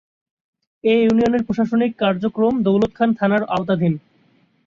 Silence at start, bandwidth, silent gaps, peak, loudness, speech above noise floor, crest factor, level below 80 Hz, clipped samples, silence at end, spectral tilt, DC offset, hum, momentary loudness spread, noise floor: 0.85 s; 7.2 kHz; none; -4 dBFS; -18 LUFS; 41 dB; 16 dB; -52 dBFS; under 0.1%; 0.65 s; -8 dB/octave; under 0.1%; none; 5 LU; -58 dBFS